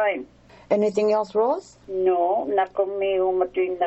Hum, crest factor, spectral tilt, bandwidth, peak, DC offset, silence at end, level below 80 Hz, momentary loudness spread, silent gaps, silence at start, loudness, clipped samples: none; 14 dB; -6 dB/octave; 8.2 kHz; -8 dBFS; under 0.1%; 0 s; -60 dBFS; 5 LU; none; 0 s; -23 LUFS; under 0.1%